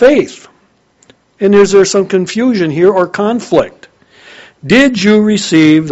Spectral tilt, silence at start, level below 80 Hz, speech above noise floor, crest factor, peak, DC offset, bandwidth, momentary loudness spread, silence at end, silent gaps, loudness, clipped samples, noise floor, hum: -5 dB/octave; 0 s; -46 dBFS; 43 dB; 10 dB; 0 dBFS; under 0.1%; 8.2 kHz; 7 LU; 0 s; none; -10 LUFS; 0.6%; -52 dBFS; none